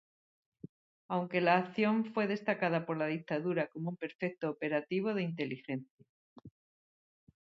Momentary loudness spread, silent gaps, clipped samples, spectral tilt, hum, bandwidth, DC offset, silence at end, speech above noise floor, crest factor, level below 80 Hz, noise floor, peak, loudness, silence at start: 12 LU; 4.15-4.19 s, 5.90-5.98 s, 6.09-6.36 s; under 0.1%; -5 dB/octave; none; 6.2 kHz; under 0.1%; 0.9 s; over 56 dB; 22 dB; -80 dBFS; under -90 dBFS; -14 dBFS; -34 LUFS; 1.1 s